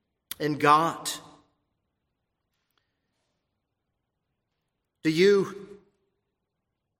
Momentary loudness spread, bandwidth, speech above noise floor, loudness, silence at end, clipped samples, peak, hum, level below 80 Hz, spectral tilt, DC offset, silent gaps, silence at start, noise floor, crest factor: 18 LU; 16 kHz; 59 dB; -24 LUFS; 1.35 s; under 0.1%; -6 dBFS; none; -74 dBFS; -4.5 dB/octave; under 0.1%; none; 0.4 s; -82 dBFS; 24 dB